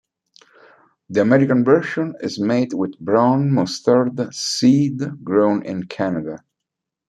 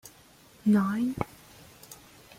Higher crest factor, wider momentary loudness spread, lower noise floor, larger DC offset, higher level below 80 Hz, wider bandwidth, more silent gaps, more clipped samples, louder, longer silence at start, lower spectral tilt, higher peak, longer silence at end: second, 16 dB vs 22 dB; second, 10 LU vs 25 LU; first, -82 dBFS vs -56 dBFS; neither; about the same, -62 dBFS vs -60 dBFS; second, 11.5 kHz vs 16 kHz; neither; neither; first, -18 LUFS vs -28 LUFS; first, 1.1 s vs 0.05 s; about the same, -6 dB/octave vs -7 dB/octave; first, -2 dBFS vs -10 dBFS; first, 0.7 s vs 0.45 s